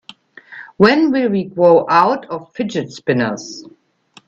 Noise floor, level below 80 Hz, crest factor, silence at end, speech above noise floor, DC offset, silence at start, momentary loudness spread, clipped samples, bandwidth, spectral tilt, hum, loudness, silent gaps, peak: -50 dBFS; -58 dBFS; 16 dB; 0.6 s; 35 dB; under 0.1%; 0.5 s; 20 LU; under 0.1%; 7.8 kHz; -6 dB/octave; none; -15 LUFS; none; 0 dBFS